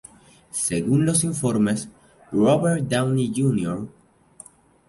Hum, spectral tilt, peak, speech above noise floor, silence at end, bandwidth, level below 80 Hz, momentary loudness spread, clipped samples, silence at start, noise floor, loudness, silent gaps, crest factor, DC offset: none; -5.5 dB/octave; -6 dBFS; 28 dB; 1 s; 12 kHz; -54 dBFS; 11 LU; under 0.1%; 0.55 s; -49 dBFS; -22 LUFS; none; 16 dB; under 0.1%